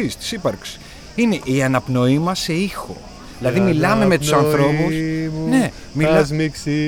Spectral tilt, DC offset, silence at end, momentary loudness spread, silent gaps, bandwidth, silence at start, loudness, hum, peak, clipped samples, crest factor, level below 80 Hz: -6 dB/octave; under 0.1%; 0 s; 15 LU; none; 19 kHz; 0 s; -18 LUFS; none; -2 dBFS; under 0.1%; 16 dB; -42 dBFS